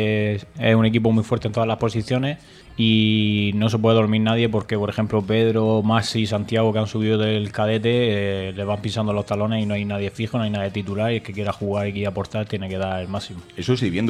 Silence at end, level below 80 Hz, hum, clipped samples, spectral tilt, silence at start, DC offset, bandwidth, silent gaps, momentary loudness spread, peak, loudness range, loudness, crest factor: 0 s; -52 dBFS; none; under 0.1%; -7 dB/octave; 0 s; under 0.1%; 11 kHz; none; 8 LU; -4 dBFS; 5 LU; -21 LUFS; 18 dB